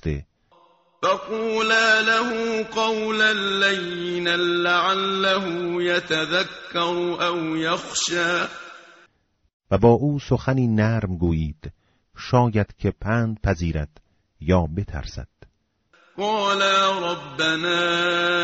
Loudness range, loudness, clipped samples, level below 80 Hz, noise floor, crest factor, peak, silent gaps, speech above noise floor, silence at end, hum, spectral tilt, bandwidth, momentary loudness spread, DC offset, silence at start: 5 LU; -21 LUFS; under 0.1%; -42 dBFS; -63 dBFS; 18 dB; -4 dBFS; 9.53-9.60 s; 41 dB; 0 s; none; -3 dB/octave; 8 kHz; 12 LU; under 0.1%; 0.05 s